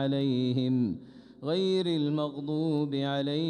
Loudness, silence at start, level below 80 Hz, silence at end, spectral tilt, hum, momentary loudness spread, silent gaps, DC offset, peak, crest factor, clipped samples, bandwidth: -29 LUFS; 0 s; -70 dBFS; 0 s; -8 dB/octave; none; 5 LU; none; under 0.1%; -16 dBFS; 12 dB; under 0.1%; 9.8 kHz